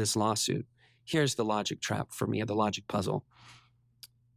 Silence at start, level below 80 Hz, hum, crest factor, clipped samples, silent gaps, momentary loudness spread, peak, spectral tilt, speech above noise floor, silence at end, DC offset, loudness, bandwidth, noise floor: 0 s; -60 dBFS; none; 18 dB; under 0.1%; none; 7 LU; -14 dBFS; -4 dB/octave; 27 dB; 0.3 s; under 0.1%; -31 LUFS; 16 kHz; -58 dBFS